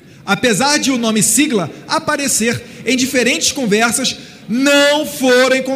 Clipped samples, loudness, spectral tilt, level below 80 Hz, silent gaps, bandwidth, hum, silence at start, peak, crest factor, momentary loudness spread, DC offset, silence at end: under 0.1%; -14 LUFS; -2.5 dB/octave; -52 dBFS; none; 16 kHz; none; 0.25 s; 0 dBFS; 14 dB; 8 LU; under 0.1%; 0 s